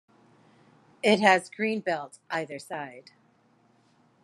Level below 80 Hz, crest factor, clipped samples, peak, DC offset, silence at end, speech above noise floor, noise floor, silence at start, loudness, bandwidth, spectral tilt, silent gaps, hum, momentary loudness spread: -82 dBFS; 24 dB; under 0.1%; -6 dBFS; under 0.1%; 1.25 s; 37 dB; -64 dBFS; 1.05 s; -27 LUFS; 12.5 kHz; -4.5 dB/octave; none; none; 17 LU